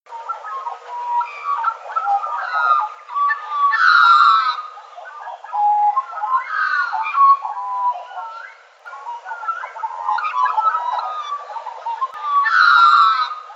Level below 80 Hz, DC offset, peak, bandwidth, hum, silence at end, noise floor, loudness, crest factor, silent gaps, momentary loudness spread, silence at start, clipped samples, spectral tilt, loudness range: under -90 dBFS; under 0.1%; -2 dBFS; 7.8 kHz; none; 0 s; -39 dBFS; -17 LUFS; 18 dB; none; 20 LU; 0.1 s; under 0.1%; 4.5 dB/octave; 7 LU